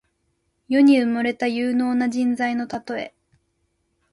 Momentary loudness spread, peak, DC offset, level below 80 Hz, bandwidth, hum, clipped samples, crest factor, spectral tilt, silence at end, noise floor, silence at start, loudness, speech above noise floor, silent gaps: 14 LU; -6 dBFS; under 0.1%; -64 dBFS; 11 kHz; none; under 0.1%; 16 dB; -5 dB/octave; 1.05 s; -71 dBFS; 0.7 s; -21 LUFS; 51 dB; none